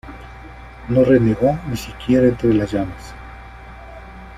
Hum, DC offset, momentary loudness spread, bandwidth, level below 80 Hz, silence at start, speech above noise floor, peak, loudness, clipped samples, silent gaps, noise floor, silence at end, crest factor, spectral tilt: none; under 0.1%; 24 LU; 15 kHz; -38 dBFS; 0.05 s; 21 dB; -2 dBFS; -17 LUFS; under 0.1%; none; -37 dBFS; 0 s; 16 dB; -8 dB/octave